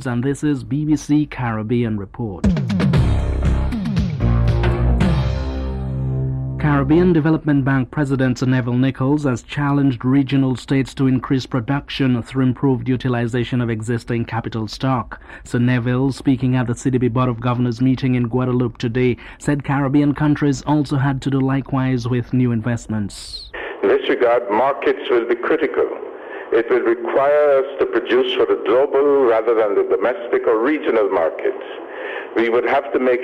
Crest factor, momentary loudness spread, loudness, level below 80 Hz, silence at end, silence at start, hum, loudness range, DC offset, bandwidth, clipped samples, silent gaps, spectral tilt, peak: 12 dB; 7 LU; -18 LUFS; -30 dBFS; 0 s; 0 s; none; 3 LU; under 0.1%; 11 kHz; under 0.1%; none; -7.5 dB/octave; -4 dBFS